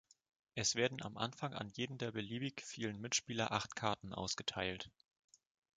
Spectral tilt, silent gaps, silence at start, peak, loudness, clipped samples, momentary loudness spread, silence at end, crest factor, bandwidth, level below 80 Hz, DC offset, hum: -3 dB/octave; none; 0.55 s; -18 dBFS; -41 LUFS; under 0.1%; 7 LU; 0.9 s; 24 dB; 9.6 kHz; -70 dBFS; under 0.1%; none